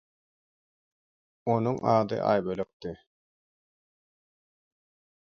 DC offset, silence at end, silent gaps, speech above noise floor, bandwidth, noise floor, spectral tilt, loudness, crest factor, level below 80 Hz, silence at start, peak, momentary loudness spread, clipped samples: under 0.1%; 2.25 s; 2.73-2.80 s; over 63 dB; 6.8 kHz; under -90 dBFS; -8 dB/octave; -28 LUFS; 22 dB; -66 dBFS; 1.45 s; -10 dBFS; 16 LU; under 0.1%